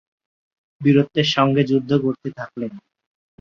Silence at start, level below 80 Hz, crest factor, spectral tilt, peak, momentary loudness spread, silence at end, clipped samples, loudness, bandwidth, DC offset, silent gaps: 0.8 s; -62 dBFS; 18 dB; -6.5 dB/octave; -2 dBFS; 14 LU; 0.6 s; under 0.1%; -19 LUFS; 7.2 kHz; under 0.1%; none